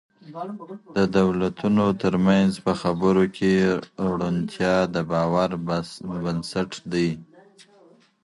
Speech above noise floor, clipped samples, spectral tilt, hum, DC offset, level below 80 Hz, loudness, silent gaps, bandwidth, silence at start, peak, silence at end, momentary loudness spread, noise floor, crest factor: 32 dB; under 0.1%; -7 dB/octave; none; under 0.1%; -52 dBFS; -23 LUFS; none; 11.5 kHz; 0.25 s; -6 dBFS; 1 s; 12 LU; -55 dBFS; 16 dB